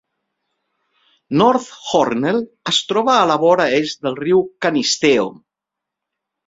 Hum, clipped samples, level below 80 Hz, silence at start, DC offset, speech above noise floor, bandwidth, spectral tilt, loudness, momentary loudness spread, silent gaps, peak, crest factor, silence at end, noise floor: none; under 0.1%; -60 dBFS; 1.3 s; under 0.1%; 67 dB; 8 kHz; -4 dB/octave; -16 LUFS; 8 LU; none; 0 dBFS; 18 dB; 1.15 s; -83 dBFS